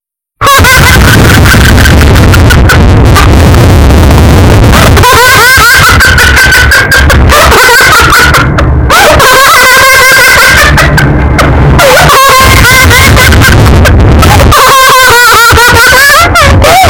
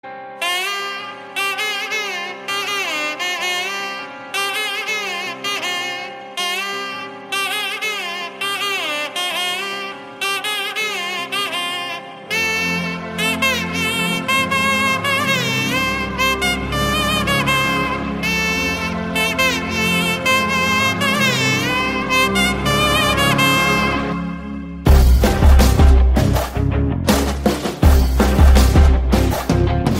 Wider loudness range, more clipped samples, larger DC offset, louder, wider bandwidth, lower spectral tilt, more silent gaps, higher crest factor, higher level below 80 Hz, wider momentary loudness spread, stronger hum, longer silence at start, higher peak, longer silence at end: second, 1 LU vs 6 LU; first, 20% vs under 0.1%; neither; first, -1 LUFS vs -17 LUFS; first, over 20 kHz vs 16 kHz; about the same, -4 dB/octave vs -4 dB/octave; neither; second, 2 dB vs 16 dB; first, -8 dBFS vs -22 dBFS; second, 3 LU vs 10 LU; neither; first, 0.4 s vs 0.05 s; about the same, 0 dBFS vs -2 dBFS; about the same, 0 s vs 0 s